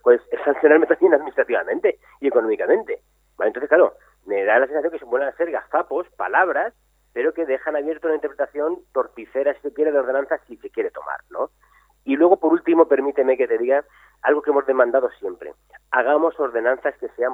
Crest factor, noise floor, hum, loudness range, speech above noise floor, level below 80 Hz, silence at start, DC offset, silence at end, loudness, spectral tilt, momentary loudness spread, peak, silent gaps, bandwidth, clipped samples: 20 dB; -57 dBFS; none; 5 LU; 37 dB; -64 dBFS; 0.05 s; under 0.1%; 0 s; -20 LUFS; -6.5 dB/octave; 11 LU; -2 dBFS; none; 3.8 kHz; under 0.1%